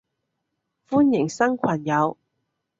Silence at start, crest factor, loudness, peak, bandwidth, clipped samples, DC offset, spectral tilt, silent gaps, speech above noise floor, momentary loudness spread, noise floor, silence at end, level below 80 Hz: 0.9 s; 18 dB; -22 LUFS; -6 dBFS; 7.8 kHz; under 0.1%; under 0.1%; -6.5 dB/octave; none; 57 dB; 5 LU; -78 dBFS; 0.65 s; -66 dBFS